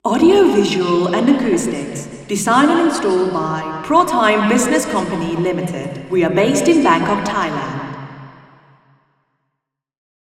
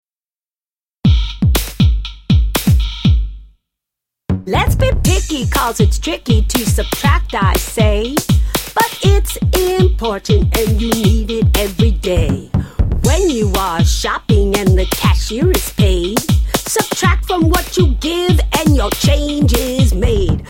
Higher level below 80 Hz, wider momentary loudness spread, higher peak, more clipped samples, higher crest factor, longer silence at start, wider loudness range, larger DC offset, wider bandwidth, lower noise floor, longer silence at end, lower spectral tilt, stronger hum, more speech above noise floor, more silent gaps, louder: second, -50 dBFS vs -18 dBFS; first, 12 LU vs 3 LU; about the same, 0 dBFS vs 0 dBFS; neither; about the same, 16 dB vs 14 dB; second, 0.05 s vs 1.05 s; about the same, 4 LU vs 2 LU; neither; second, 15 kHz vs 17 kHz; second, -78 dBFS vs under -90 dBFS; first, 2 s vs 0 s; about the same, -5 dB/octave vs -5 dB/octave; neither; second, 62 dB vs over 77 dB; neither; about the same, -16 LUFS vs -15 LUFS